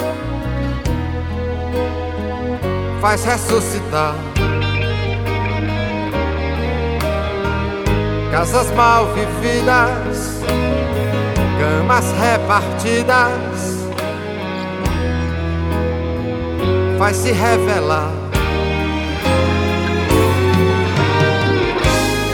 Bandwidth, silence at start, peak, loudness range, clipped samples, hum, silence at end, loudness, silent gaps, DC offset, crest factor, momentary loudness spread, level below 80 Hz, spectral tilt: 19 kHz; 0 s; 0 dBFS; 4 LU; under 0.1%; none; 0 s; -17 LUFS; none; under 0.1%; 16 dB; 8 LU; -28 dBFS; -5.5 dB/octave